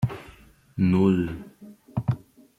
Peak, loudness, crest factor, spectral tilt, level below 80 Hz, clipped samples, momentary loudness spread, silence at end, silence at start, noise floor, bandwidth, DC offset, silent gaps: -8 dBFS; -25 LUFS; 18 dB; -9.5 dB/octave; -52 dBFS; under 0.1%; 20 LU; 0.4 s; 0 s; -52 dBFS; 7.8 kHz; under 0.1%; none